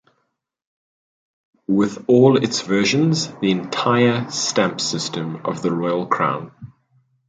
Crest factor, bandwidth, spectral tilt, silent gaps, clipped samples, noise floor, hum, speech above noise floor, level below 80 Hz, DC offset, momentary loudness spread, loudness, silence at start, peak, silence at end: 18 dB; 9.4 kHz; -5 dB/octave; none; under 0.1%; -73 dBFS; none; 54 dB; -62 dBFS; under 0.1%; 10 LU; -19 LUFS; 1.7 s; -2 dBFS; 0.6 s